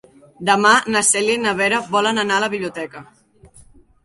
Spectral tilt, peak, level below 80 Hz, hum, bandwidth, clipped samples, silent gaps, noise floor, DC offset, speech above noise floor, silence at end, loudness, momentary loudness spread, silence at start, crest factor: -2 dB/octave; -2 dBFS; -58 dBFS; none; 11.5 kHz; under 0.1%; none; -48 dBFS; under 0.1%; 30 dB; 0.6 s; -17 LUFS; 12 LU; 0.4 s; 18 dB